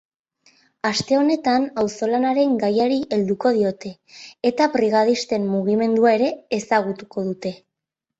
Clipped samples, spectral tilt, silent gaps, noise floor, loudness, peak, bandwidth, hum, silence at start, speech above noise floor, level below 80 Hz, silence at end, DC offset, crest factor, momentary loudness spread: under 0.1%; -5.5 dB/octave; none; -84 dBFS; -20 LUFS; -4 dBFS; 8.4 kHz; none; 0.85 s; 64 dB; -62 dBFS; 0.65 s; under 0.1%; 16 dB; 10 LU